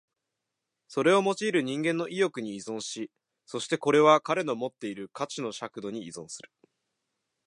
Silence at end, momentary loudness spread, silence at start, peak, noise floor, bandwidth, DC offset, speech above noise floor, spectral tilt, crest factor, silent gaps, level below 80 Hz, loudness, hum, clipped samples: 1.05 s; 17 LU; 0.9 s; -6 dBFS; -85 dBFS; 11.5 kHz; under 0.1%; 57 dB; -4.5 dB/octave; 22 dB; none; -80 dBFS; -28 LUFS; none; under 0.1%